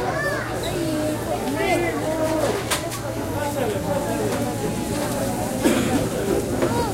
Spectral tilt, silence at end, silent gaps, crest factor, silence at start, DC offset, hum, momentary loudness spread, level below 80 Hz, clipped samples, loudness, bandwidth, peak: -5 dB/octave; 0 s; none; 18 dB; 0 s; 0.1%; none; 4 LU; -40 dBFS; under 0.1%; -23 LUFS; 16 kHz; -4 dBFS